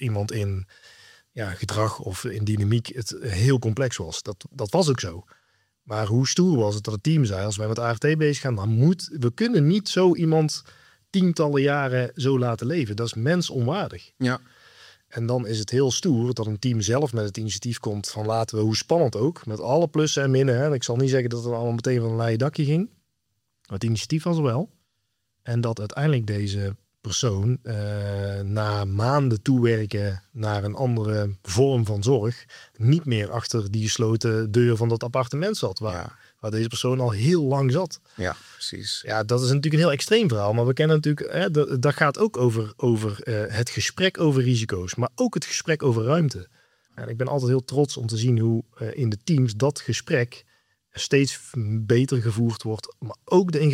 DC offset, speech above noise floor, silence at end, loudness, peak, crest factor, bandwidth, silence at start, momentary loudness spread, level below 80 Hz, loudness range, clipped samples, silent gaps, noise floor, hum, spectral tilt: under 0.1%; 54 dB; 0 s; -24 LUFS; -4 dBFS; 20 dB; 14.5 kHz; 0 s; 10 LU; -62 dBFS; 4 LU; under 0.1%; none; -77 dBFS; none; -6 dB/octave